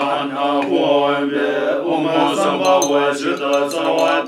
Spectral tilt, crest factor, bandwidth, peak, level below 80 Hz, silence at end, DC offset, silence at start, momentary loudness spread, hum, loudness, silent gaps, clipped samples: -3.5 dB/octave; 14 dB; 16 kHz; -2 dBFS; -74 dBFS; 0 s; under 0.1%; 0 s; 4 LU; none; -17 LUFS; none; under 0.1%